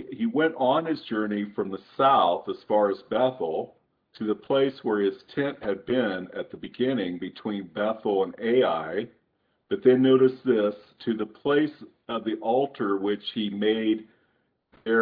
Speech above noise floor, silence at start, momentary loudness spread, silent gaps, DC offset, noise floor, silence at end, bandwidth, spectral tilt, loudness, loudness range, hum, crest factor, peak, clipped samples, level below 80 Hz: 47 dB; 0 s; 12 LU; none; under 0.1%; -72 dBFS; 0 s; 5 kHz; -9 dB/octave; -26 LUFS; 4 LU; none; 18 dB; -8 dBFS; under 0.1%; -70 dBFS